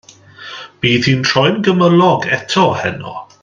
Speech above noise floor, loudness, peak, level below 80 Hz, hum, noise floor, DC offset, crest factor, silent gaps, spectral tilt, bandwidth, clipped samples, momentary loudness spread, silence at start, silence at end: 23 dB; -13 LUFS; 0 dBFS; -50 dBFS; none; -36 dBFS; under 0.1%; 14 dB; none; -5.5 dB/octave; 7.6 kHz; under 0.1%; 19 LU; 0.4 s; 0.2 s